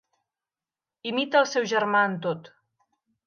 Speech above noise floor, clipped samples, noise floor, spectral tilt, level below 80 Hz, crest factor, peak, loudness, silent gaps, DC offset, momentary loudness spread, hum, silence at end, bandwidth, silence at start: over 66 dB; under 0.1%; under -90 dBFS; -4 dB/octave; -80 dBFS; 20 dB; -8 dBFS; -24 LUFS; none; under 0.1%; 12 LU; none; 0.8 s; 7 kHz; 1.05 s